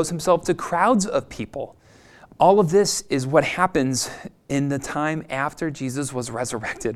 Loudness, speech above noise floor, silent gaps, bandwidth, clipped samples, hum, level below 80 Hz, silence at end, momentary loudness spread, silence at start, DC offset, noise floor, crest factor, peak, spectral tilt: -22 LUFS; 28 dB; none; 15 kHz; under 0.1%; none; -50 dBFS; 0 s; 12 LU; 0 s; under 0.1%; -50 dBFS; 20 dB; -2 dBFS; -4.5 dB/octave